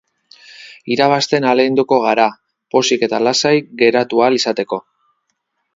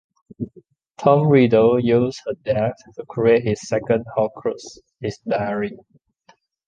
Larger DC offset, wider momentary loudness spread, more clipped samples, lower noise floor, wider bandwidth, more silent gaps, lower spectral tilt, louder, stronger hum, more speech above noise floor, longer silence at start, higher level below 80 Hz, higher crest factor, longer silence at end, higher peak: neither; second, 8 LU vs 19 LU; neither; first, -70 dBFS vs -57 dBFS; second, 7.8 kHz vs 9 kHz; neither; second, -4 dB/octave vs -7.5 dB/octave; first, -15 LUFS vs -19 LUFS; neither; first, 56 dB vs 38 dB; first, 0.6 s vs 0.4 s; second, -64 dBFS vs -54 dBFS; about the same, 16 dB vs 18 dB; about the same, 0.95 s vs 0.9 s; about the same, 0 dBFS vs -2 dBFS